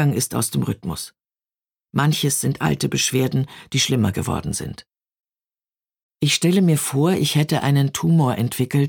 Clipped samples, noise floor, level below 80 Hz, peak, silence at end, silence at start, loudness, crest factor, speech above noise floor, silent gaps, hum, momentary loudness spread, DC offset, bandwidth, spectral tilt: under 0.1%; under -90 dBFS; -50 dBFS; -4 dBFS; 0 s; 0 s; -20 LUFS; 16 dB; over 71 dB; 6.03-6.09 s; none; 10 LU; under 0.1%; 19 kHz; -5 dB/octave